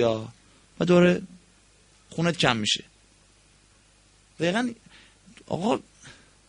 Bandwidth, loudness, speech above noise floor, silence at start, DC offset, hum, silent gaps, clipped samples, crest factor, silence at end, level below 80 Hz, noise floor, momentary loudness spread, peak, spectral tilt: 10.5 kHz; -25 LUFS; 35 dB; 0 s; under 0.1%; none; none; under 0.1%; 24 dB; 0.35 s; -60 dBFS; -59 dBFS; 18 LU; -2 dBFS; -5 dB/octave